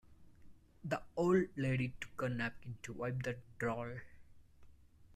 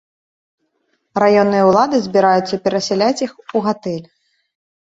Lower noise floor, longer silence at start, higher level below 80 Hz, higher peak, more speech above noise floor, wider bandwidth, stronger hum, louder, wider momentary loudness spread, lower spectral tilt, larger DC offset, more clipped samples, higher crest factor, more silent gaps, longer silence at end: second, -61 dBFS vs -67 dBFS; second, 0.1 s vs 1.15 s; about the same, -62 dBFS vs -58 dBFS; second, -22 dBFS vs -2 dBFS; second, 23 dB vs 52 dB; first, 13.5 kHz vs 7.8 kHz; neither; second, -39 LUFS vs -16 LUFS; first, 15 LU vs 11 LU; first, -7 dB/octave vs -5.5 dB/octave; neither; neither; about the same, 18 dB vs 16 dB; neither; second, 0 s vs 0.8 s